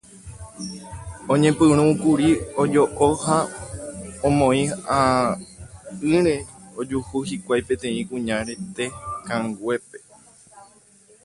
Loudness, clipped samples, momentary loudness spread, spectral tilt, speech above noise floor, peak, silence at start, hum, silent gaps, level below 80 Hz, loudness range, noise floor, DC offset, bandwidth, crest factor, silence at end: -21 LUFS; under 0.1%; 17 LU; -5.5 dB/octave; 32 dB; -4 dBFS; 0.15 s; none; none; -46 dBFS; 7 LU; -53 dBFS; under 0.1%; 11.5 kHz; 18 dB; 0.6 s